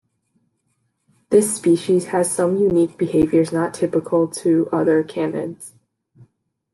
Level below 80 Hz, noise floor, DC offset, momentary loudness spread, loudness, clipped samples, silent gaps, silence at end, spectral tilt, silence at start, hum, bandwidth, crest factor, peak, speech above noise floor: -54 dBFS; -70 dBFS; under 0.1%; 7 LU; -19 LUFS; under 0.1%; none; 1.05 s; -6 dB/octave; 1.3 s; none; 12.5 kHz; 16 dB; -4 dBFS; 52 dB